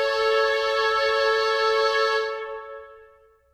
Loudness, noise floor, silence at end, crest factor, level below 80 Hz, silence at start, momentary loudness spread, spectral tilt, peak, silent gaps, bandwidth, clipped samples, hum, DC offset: -22 LUFS; -55 dBFS; 0.55 s; 14 dB; -58 dBFS; 0 s; 15 LU; 0 dB/octave; -10 dBFS; none; 13.5 kHz; under 0.1%; none; under 0.1%